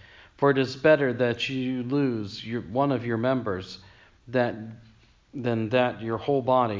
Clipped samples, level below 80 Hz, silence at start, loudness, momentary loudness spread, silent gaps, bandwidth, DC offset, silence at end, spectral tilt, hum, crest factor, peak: under 0.1%; -58 dBFS; 0.4 s; -26 LUFS; 12 LU; none; 7.6 kHz; under 0.1%; 0 s; -7 dB/octave; none; 20 dB; -6 dBFS